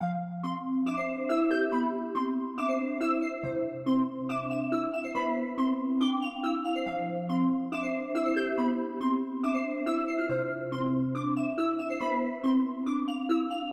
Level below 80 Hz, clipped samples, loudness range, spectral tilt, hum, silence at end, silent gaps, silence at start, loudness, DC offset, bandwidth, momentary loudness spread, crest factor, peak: -68 dBFS; under 0.1%; 1 LU; -7 dB/octave; none; 0 s; none; 0 s; -30 LUFS; under 0.1%; 8.8 kHz; 4 LU; 14 dB; -16 dBFS